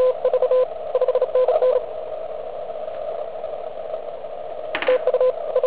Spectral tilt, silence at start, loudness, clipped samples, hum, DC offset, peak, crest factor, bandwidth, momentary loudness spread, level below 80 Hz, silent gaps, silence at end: -7 dB/octave; 0 s; -22 LUFS; under 0.1%; none; 1%; -6 dBFS; 16 dB; 4 kHz; 13 LU; -60 dBFS; none; 0 s